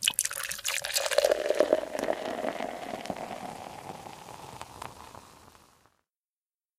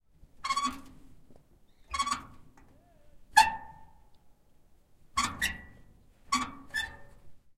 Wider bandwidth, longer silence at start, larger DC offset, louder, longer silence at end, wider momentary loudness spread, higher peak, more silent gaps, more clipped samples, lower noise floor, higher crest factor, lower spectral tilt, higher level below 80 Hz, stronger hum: about the same, 16 kHz vs 16.5 kHz; second, 0 s vs 0.4 s; neither; about the same, -30 LUFS vs -31 LUFS; first, 1.3 s vs 0.2 s; about the same, 19 LU vs 20 LU; about the same, -4 dBFS vs -6 dBFS; neither; neither; first, under -90 dBFS vs -60 dBFS; about the same, 30 dB vs 30 dB; about the same, -1.5 dB/octave vs -1 dB/octave; second, -66 dBFS vs -56 dBFS; neither